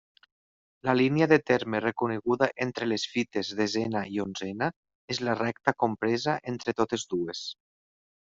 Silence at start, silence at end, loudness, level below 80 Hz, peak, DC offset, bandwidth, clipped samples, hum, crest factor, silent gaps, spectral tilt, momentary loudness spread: 0.85 s; 0.75 s; -28 LUFS; -66 dBFS; -6 dBFS; under 0.1%; 7.8 kHz; under 0.1%; none; 24 dB; 4.76-4.83 s, 4.95-5.08 s; -5 dB/octave; 10 LU